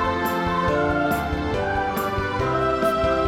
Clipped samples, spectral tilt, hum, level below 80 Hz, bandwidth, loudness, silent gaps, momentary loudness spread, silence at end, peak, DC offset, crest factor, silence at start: under 0.1%; -6 dB/octave; none; -36 dBFS; 18 kHz; -22 LUFS; none; 3 LU; 0 s; -8 dBFS; 0.1%; 14 dB; 0 s